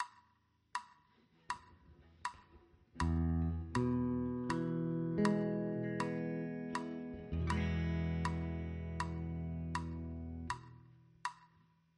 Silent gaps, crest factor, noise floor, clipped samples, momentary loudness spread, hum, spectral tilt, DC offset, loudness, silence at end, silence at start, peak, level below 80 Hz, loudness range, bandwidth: none; 22 dB; -74 dBFS; under 0.1%; 11 LU; none; -7 dB/octave; under 0.1%; -39 LUFS; 0.55 s; 0 s; -16 dBFS; -50 dBFS; 7 LU; 11 kHz